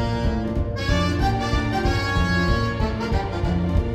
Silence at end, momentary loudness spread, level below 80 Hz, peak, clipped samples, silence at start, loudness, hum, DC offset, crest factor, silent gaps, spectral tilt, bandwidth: 0 s; 4 LU; -26 dBFS; -8 dBFS; under 0.1%; 0 s; -23 LUFS; none; under 0.1%; 14 dB; none; -6.5 dB/octave; 14.5 kHz